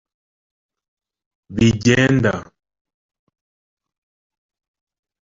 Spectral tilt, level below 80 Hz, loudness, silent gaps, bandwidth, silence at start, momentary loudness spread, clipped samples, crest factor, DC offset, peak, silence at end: -5.5 dB/octave; -46 dBFS; -16 LUFS; none; 7.8 kHz; 1.5 s; 14 LU; under 0.1%; 20 dB; under 0.1%; -2 dBFS; 2.8 s